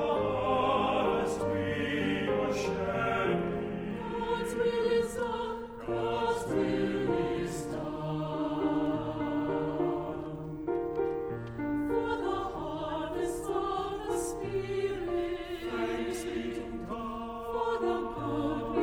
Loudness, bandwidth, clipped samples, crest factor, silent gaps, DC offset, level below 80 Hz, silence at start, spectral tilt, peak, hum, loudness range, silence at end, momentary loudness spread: -32 LUFS; over 20 kHz; under 0.1%; 16 dB; none; under 0.1%; -52 dBFS; 0 s; -6 dB/octave; -16 dBFS; none; 4 LU; 0 s; 7 LU